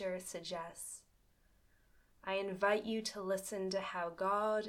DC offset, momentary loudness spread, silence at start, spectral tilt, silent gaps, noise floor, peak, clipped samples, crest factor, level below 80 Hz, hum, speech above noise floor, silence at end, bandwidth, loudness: under 0.1%; 13 LU; 0 s; -3.5 dB/octave; none; -71 dBFS; -20 dBFS; under 0.1%; 20 dB; -72 dBFS; none; 33 dB; 0 s; 17.5 kHz; -39 LUFS